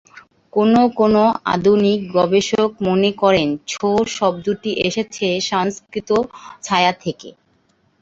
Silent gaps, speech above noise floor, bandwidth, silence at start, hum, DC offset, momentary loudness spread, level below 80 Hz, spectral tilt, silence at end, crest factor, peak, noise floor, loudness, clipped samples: none; 43 dB; 8 kHz; 0.15 s; none; under 0.1%; 9 LU; -52 dBFS; -5 dB/octave; 0.7 s; 16 dB; -2 dBFS; -60 dBFS; -17 LUFS; under 0.1%